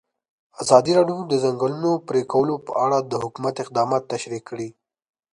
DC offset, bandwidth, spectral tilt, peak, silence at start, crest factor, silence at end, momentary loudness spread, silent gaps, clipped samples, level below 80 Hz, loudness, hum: under 0.1%; 11 kHz; -5.5 dB/octave; 0 dBFS; 0.6 s; 22 dB; 0.6 s; 13 LU; none; under 0.1%; -64 dBFS; -21 LUFS; none